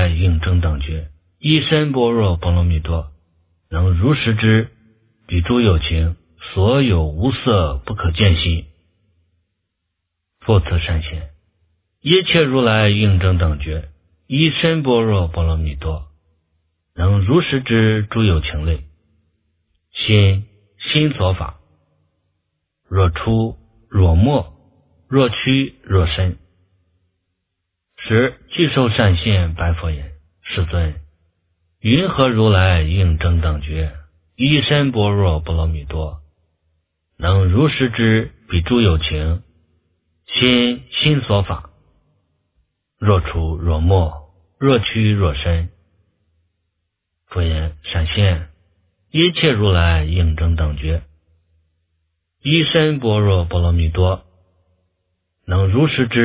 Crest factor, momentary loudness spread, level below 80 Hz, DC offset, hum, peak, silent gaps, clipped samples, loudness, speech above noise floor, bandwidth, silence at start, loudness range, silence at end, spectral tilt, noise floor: 18 dB; 12 LU; -26 dBFS; under 0.1%; none; 0 dBFS; none; under 0.1%; -17 LUFS; 61 dB; 4 kHz; 0 s; 4 LU; 0 s; -11 dB/octave; -76 dBFS